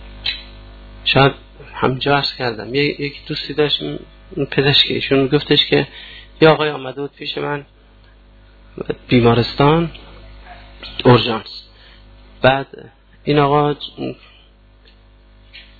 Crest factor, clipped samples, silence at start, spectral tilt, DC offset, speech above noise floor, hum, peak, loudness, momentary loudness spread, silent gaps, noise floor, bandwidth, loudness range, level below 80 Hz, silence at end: 18 dB; under 0.1%; 0 s; -8 dB/octave; under 0.1%; 31 dB; 50 Hz at -40 dBFS; 0 dBFS; -16 LUFS; 19 LU; none; -47 dBFS; 4.8 kHz; 4 LU; -42 dBFS; 0.2 s